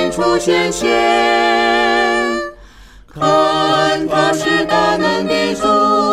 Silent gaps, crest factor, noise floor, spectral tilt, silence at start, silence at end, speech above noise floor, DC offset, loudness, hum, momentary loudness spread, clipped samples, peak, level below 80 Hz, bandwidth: none; 12 dB; -40 dBFS; -4 dB/octave; 0 s; 0 s; 27 dB; under 0.1%; -14 LUFS; none; 4 LU; under 0.1%; -2 dBFS; -42 dBFS; 15.5 kHz